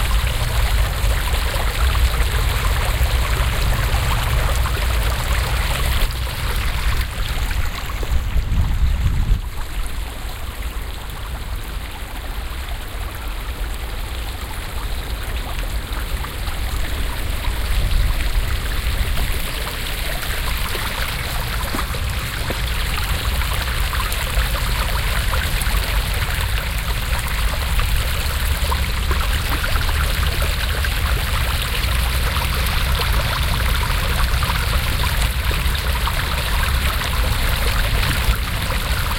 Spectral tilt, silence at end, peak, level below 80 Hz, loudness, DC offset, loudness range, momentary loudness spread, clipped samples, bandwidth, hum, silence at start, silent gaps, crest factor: -3.5 dB/octave; 0 s; -2 dBFS; -20 dBFS; -22 LUFS; under 0.1%; 8 LU; 9 LU; under 0.1%; 17 kHz; none; 0 s; none; 16 dB